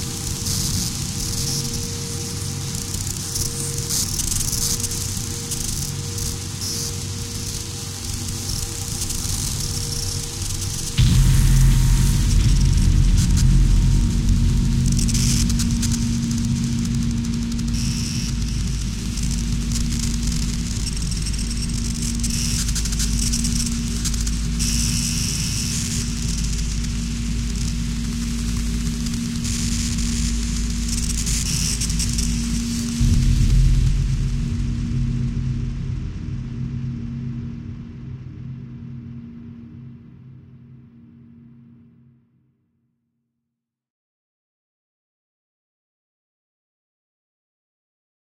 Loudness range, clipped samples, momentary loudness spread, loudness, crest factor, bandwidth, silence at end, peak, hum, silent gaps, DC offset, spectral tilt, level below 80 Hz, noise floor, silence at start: 10 LU; under 0.1%; 10 LU; -22 LUFS; 16 dB; 17 kHz; 6.8 s; -6 dBFS; none; none; under 0.1%; -4 dB/octave; -24 dBFS; -82 dBFS; 0 s